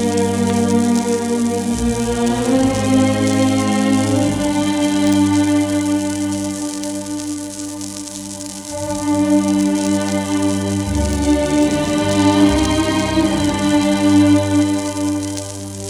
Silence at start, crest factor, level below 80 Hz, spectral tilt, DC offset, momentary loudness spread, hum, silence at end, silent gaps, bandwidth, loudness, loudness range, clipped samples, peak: 0 s; 14 dB; -34 dBFS; -5 dB/octave; under 0.1%; 11 LU; none; 0 s; none; 14 kHz; -17 LUFS; 6 LU; under 0.1%; -2 dBFS